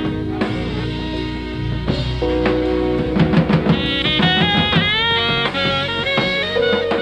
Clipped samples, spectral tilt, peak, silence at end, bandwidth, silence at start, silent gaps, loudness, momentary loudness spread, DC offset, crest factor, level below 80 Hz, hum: under 0.1%; -6.5 dB/octave; -2 dBFS; 0 s; 9.8 kHz; 0 s; none; -17 LUFS; 9 LU; 0.2%; 16 dB; -32 dBFS; none